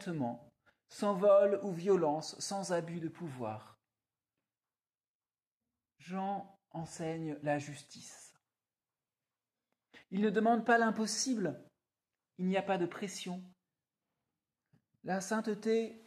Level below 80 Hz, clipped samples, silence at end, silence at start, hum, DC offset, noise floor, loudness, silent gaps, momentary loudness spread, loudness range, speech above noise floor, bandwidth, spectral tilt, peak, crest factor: -82 dBFS; under 0.1%; 0.1 s; 0 s; none; under 0.1%; under -90 dBFS; -34 LUFS; 5.08-5.20 s, 5.47-5.58 s; 20 LU; 13 LU; over 56 dB; 14.5 kHz; -5 dB/octave; -16 dBFS; 22 dB